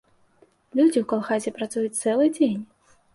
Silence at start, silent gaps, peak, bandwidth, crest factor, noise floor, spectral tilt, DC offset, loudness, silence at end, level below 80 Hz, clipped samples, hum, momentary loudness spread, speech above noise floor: 0.75 s; none; -10 dBFS; 11.5 kHz; 16 dB; -60 dBFS; -5 dB/octave; under 0.1%; -23 LUFS; 0.5 s; -70 dBFS; under 0.1%; none; 8 LU; 38 dB